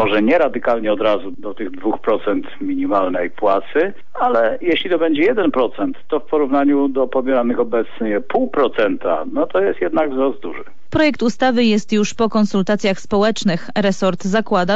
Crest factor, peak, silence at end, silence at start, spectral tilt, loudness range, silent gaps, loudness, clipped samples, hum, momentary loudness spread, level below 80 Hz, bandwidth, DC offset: 12 dB; -4 dBFS; 0 s; 0 s; -5.5 dB/octave; 2 LU; none; -18 LUFS; under 0.1%; none; 7 LU; -50 dBFS; 8 kHz; 5%